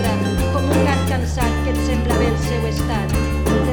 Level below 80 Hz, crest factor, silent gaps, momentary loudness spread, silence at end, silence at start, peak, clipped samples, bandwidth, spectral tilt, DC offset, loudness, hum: -24 dBFS; 14 dB; none; 4 LU; 0 s; 0 s; -4 dBFS; under 0.1%; over 20 kHz; -6 dB/octave; under 0.1%; -19 LUFS; none